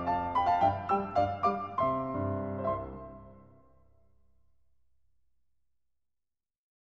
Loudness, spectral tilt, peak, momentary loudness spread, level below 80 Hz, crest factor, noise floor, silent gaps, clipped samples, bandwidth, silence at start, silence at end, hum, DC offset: -31 LUFS; -8 dB/octave; -16 dBFS; 15 LU; -58 dBFS; 18 dB; -89 dBFS; none; under 0.1%; 7.2 kHz; 0 s; 3.5 s; none; under 0.1%